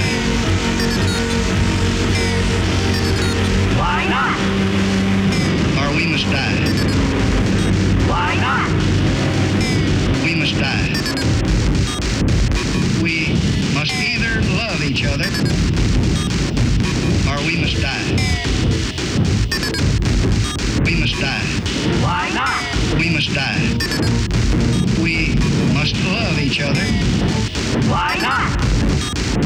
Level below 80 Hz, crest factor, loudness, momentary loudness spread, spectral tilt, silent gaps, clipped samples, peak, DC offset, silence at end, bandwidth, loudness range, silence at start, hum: -24 dBFS; 8 dB; -17 LUFS; 2 LU; -5 dB/octave; none; under 0.1%; -8 dBFS; under 0.1%; 0 s; 14 kHz; 1 LU; 0 s; none